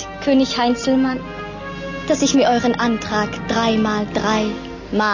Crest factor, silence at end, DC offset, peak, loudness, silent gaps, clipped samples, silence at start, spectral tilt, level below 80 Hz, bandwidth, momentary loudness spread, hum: 14 dB; 0 s; under 0.1%; -6 dBFS; -18 LUFS; none; under 0.1%; 0 s; -4.5 dB/octave; -42 dBFS; 7.4 kHz; 13 LU; none